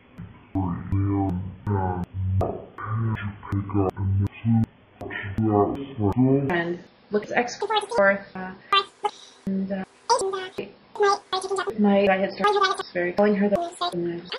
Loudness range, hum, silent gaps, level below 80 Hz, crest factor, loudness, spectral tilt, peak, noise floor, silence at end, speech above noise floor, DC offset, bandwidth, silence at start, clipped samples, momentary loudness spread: 4 LU; none; none; -50 dBFS; 18 dB; -25 LUFS; -6 dB/octave; -6 dBFS; -43 dBFS; 0 s; 21 dB; under 0.1%; 11.5 kHz; 0.2 s; under 0.1%; 11 LU